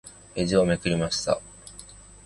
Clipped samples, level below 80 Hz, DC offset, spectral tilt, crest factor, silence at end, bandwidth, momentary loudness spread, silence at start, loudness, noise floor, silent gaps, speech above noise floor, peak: under 0.1%; -48 dBFS; under 0.1%; -5 dB/octave; 18 dB; 0.25 s; 11.5 kHz; 21 LU; 0.05 s; -25 LUFS; -47 dBFS; none; 23 dB; -8 dBFS